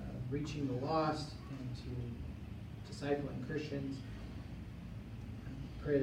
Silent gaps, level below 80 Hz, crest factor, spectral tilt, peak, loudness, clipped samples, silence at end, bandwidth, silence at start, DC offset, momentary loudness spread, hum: none; -54 dBFS; 20 dB; -7 dB/octave; -22 dBFS; -42 LUFS; under 0.1%; 0 s; 16 kHz; 0 s; under 0.1%; 12 LU; none